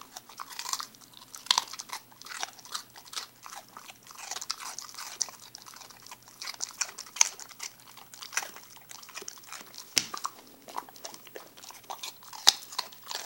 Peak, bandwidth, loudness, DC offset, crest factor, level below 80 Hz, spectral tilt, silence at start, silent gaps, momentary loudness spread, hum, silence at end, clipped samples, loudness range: 0 dBFS; 17 kHz; -32 LUFS; under 0.1%; 36 dB; -80 dBFS; 2 dB/octave; 0 s; none; 21 LU; none; 0 s; under 0.1%; 7 LU